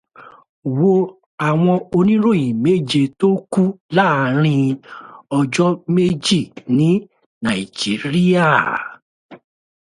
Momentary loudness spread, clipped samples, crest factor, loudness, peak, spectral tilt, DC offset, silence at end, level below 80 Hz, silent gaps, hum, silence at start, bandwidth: 9 LU; under 0.1%; 16 dB; -17 LUFS; 0 dBFS; -6.5 dB/octave; under 0.1%; 0.55 s; -56 dBFS; 0.49-0.62 s, 1.26-1.38 s, 3.80-3.89 s, 7.26-7.41 s, 9.02-9.29 s; none; 0.2 s; 11.5 kHz